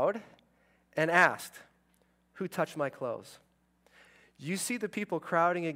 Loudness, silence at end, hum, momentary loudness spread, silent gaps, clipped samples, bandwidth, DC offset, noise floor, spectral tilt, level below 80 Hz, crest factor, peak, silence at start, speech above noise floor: -31 LUFS; 0 s; none; 17 LU; none; under 0.1%; 16 kHz; under 0.1%; -70 dBFS; -4.5 dB/octave; -80 dBFS; 24 dB; -8 dBFS; 0 s; 39 dB